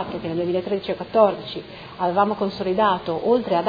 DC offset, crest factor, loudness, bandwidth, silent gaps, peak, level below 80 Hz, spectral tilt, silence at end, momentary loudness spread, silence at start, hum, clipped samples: under 0.1%; 18 dB; -22 LUFS; 5 kHz; none; -4 dBFS; -54 dBFS; -8 dB/octave; 0 s; 11 LU; 0 s; none; under 0.1%